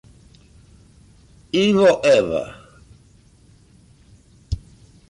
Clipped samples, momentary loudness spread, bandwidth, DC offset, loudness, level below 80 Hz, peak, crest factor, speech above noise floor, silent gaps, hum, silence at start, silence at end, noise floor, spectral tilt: under 0.1%; 17 LU; 11.5 kHz; under 0.1%; -18 LUFS; -44 dBFS; -6 dBFS; 16 dB; 36 dB; none; none; 1.55 s; 0.55 s; -52 dBFS; -5.5 dB/octave